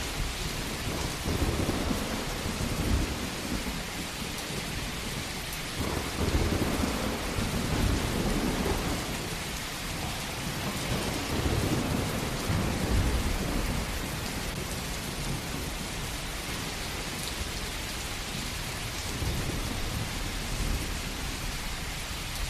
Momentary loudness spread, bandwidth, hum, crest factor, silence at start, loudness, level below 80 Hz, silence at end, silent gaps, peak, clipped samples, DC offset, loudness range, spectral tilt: 5 LU; 14.5 kHz; none; 16 dB; 0 s; -32 LUFS; -36 dBFS; 0 s; none; -16 dBFS; under 0.1%; under 0.1%; 4 LU; -4 dB/octave